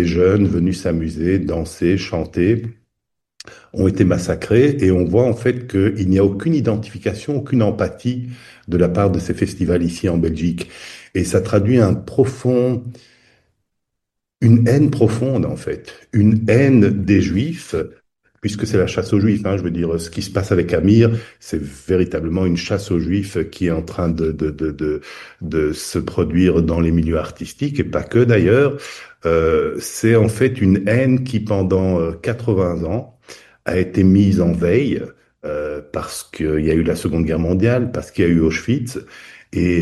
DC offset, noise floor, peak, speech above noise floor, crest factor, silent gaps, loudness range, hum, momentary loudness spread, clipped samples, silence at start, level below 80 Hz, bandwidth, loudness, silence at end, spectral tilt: under 0.1%; -79 dBFS; 0 dBFS; 62 dB; 18 dB; none; 4 LU; none; 12 LU; under 0.1%; 0 s; -38 dBFS; 12.5 kHz; -18 LUFS; 0 s; -7.5 dB/octave